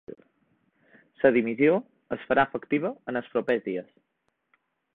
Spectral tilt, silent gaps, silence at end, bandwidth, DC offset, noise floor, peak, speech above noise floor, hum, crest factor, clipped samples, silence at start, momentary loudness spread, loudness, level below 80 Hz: -9 dB/octave; none; 1.1 s; 4.5 kHz; under 0.1%; -71 dBFS; -6 dBFS; 46 dB; none; 22 dB; under 0.1%; 0.1 s; 14 LU; -26 LUFS; -68 dBFS